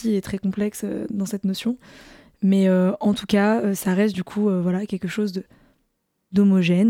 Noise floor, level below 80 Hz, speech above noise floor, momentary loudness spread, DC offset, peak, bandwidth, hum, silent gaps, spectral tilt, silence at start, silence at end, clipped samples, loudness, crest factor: -72 dBFS; -56 dBFS; 51 dB; 10 LU; under 0.1%; -6 dBFS; 16.5 kHz; none; none; -7 dB/octave; 0 s; 0 s; under 0.1%; -22 LUFS; 16 dB